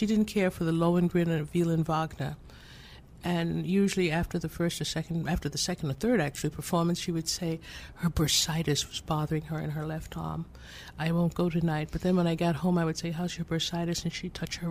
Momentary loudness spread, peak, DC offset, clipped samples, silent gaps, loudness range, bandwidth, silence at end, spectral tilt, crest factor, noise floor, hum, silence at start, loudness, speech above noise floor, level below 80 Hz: 11 LU; -14 dBFS; under 0.1%; under 0.1%; none; 2 LU; 15.5 kHz; 0 s; -5 dB/octave; 16 dB; -50 dBFS; none; 0 s; -30 LUFS; 20 dB; -48 dBFS